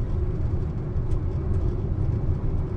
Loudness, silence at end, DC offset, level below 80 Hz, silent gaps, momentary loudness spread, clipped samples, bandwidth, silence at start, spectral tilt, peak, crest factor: -28 LUFS; 0 s; under 0.1%; -28 dBFS; none; 2 LU; under 0.1%; 4.5 kHz; 0 s; -10.5 dB/octave; -12 dBFS; 12 dB